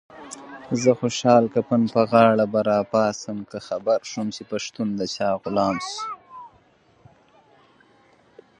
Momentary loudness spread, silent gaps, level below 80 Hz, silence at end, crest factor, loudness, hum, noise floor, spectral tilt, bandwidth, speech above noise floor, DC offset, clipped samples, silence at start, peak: 19 LU; none; -62 dBFS; 2.15 s; 22 dB; -22 LUFS; none; -58 dBFS; -5.5 dB/octave; 10.5 kHz; 37 dB; under 0.1%; under 0.1%; 0.15 s; -2 dBFS